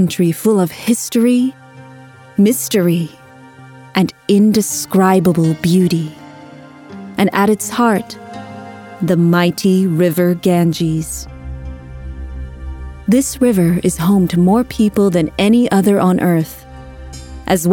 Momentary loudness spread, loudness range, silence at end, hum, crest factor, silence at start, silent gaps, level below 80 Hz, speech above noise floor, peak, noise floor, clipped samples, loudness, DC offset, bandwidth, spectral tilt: 18 LU; 5 LU; 0 s; none; 14 dB; 0 s; none; -36 dBFS; 26 dB; 0 dBFS; -39 dBFS; under 0.1%; -14 LUFS; under 0.1%; 19 kHz; -6 dB/octave